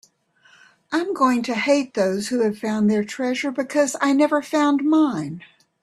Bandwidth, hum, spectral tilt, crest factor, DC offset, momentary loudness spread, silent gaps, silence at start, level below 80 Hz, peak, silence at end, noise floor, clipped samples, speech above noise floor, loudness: 13 kHz; none; -5 dB/octave; 16 dB; under 0.1%; 7 LU; none; 0.9 s; -66 dBFS; -6 dBFS; 0.45 s; -57 dBFS; under 0.1%; 37 dB; -21 LUFS